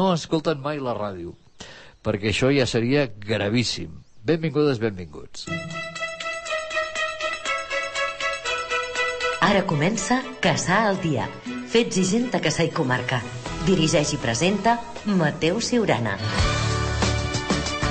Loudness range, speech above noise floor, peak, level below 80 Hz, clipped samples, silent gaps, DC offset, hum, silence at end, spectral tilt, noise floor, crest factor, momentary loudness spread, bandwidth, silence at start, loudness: 4 LU; 21 dB; -8 dBFS; -40 dBFS; under 0.1%; none; under 0.1%; none; 0 s; -4.5 dB/octave; -43 dBFS; 16 dB; 11 LU; 8.4 kHz; 0 s; -23 LUFS